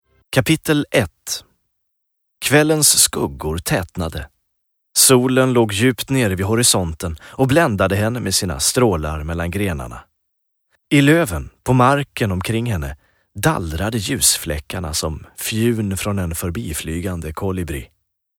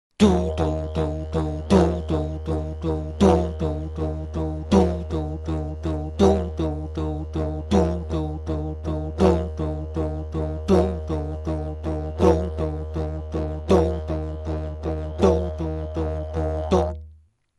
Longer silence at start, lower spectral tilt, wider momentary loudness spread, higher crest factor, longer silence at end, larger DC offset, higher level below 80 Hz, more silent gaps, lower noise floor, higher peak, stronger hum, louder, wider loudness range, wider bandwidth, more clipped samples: about the same, 0.3 s vs 0.2 s; second, -4 dB/octave vs -8 dB/octave; first, 13 LU vs 9 LU; about the same, 18 dB vs 20 dB; about the same, 0.55 s vs 0.45 s; neither; about the same, -36 dBFS vs -32 dBFS; neither; first, -72 dBFS vs -52 dBFS; first, 0 dBFS vs -4 dBFS; neither; first, -18 LUFS vs -24 LUFS; first, 5 LU vs 2 LU; first, 19.5 kHz vs 11.5 kHz; neither